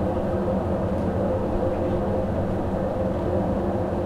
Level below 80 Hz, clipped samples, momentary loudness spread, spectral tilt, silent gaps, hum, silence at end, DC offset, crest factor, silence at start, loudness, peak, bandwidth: -36 dBFS; under 0.1%; 1 LU; -9.5 dB/octave; none; none; 0 s; under 0.1%; 12 dB; 0 s; -25 LUFS; -12 dBFS; 11.5 kHz